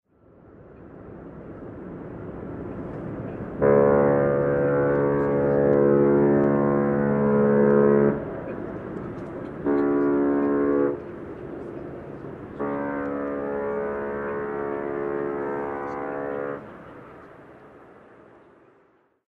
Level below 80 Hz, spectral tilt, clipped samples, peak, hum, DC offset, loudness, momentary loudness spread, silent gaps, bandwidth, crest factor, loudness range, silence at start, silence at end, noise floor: -50 dBFS; -11.5 dB/octave; under 0.1%; -6 dBFS; none; under 0.1%; -23 LUFS; 19 LU; none; 3.7 kHz; 18 dB; 13 LU; 0.6 s; 1.45 s; -62 dBFS